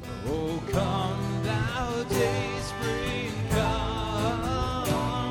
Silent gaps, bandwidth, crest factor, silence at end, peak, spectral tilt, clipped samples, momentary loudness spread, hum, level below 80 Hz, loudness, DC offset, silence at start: none; 19 kHz; 16 dB; 0 s; -12 dBFS; -5.5 dB/octave; under 0.1%; 4 LU; none; -40 dBFS; -28 LUFS; under 0.1%; 0 s